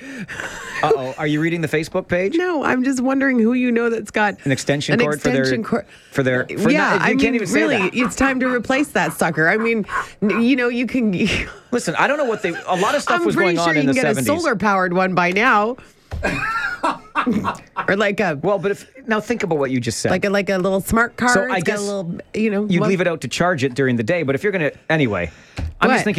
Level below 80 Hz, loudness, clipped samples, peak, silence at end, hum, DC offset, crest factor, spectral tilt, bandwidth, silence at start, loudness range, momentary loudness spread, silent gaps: -44 dBFS; -19 LUFS; under 0.1%; -2 dBFS; 0 s; none; under 0.1%; 16 dB; -5 dB/octave; 15 kHz; 0 s; 3 LU; 7 LU; none